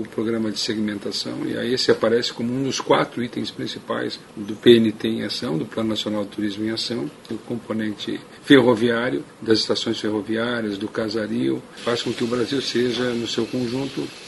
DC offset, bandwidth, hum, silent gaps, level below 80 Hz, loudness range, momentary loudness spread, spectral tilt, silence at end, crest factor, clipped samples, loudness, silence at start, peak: under 0.1%; 11.5 kHz; none; none; -60 dBFS; 3 LU; 12 LU; -5 dB/octave; 0 s; 22 dB; under 0.1%; -22 LUFS; 0 s; 0 dBFS